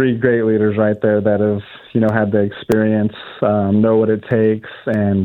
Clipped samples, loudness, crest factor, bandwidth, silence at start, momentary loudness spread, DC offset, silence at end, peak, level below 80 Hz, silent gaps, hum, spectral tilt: under 0.1%; -16 LUFS; 16 dB; 6.6 kHz; 0 s; 7 LU; under 0.1%; 0 s; 0 dBFS; -54 dBFS; none; none; -9 dB/octave